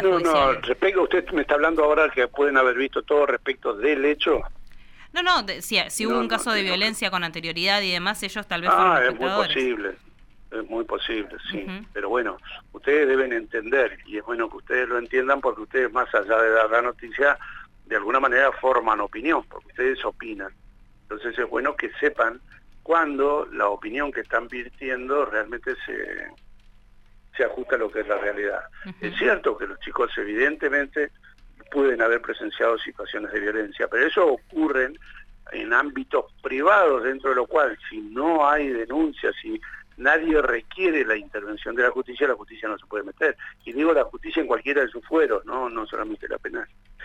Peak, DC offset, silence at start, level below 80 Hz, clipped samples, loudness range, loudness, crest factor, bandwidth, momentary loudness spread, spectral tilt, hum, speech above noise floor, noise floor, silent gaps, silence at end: -6 dBFS; under 0.1%; 0 s; -48 dBFS; under 0.1%; 6 LU; -23 LUFS; 18 dB; 16 kHz; 13 LU; -3.5 dB/octave; none; 27 dB; -51 dBFS; none; 0 s